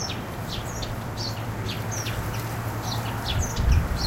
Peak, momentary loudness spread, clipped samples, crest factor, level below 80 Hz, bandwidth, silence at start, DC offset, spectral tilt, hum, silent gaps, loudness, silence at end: -10 dBFS; 8 LU; under 0.1%; 18 dB; -32 dBFS; 16 kHz; 0 s; under 0.1%; -4.5 dB/octave; none; none; -29 LUFS; 0 s